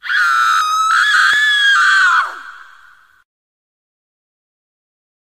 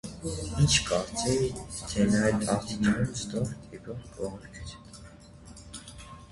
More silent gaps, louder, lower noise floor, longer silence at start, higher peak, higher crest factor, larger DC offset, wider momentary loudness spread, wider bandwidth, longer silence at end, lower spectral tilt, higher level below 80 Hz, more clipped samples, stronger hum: neither; first, -11 LUFS vs -28 LUFS; about the same, -47 dBFS vs -49 dBFS; about the same, 0.05 s vs 0.05 s; first, -2 dBFS vs -10 dBFS; second, 14 dB vs 22 dB; first, 0.2% vs under 0.1%; second, 6 LU vs 22 LU; first, 15 kHz vs 11.5 kHz; first, 2.65 s vs 0 s; second, 4.5 dB/octave vs -4.5 dB/octave; second, -68 dBFS vs -46 dBFS; neither; neither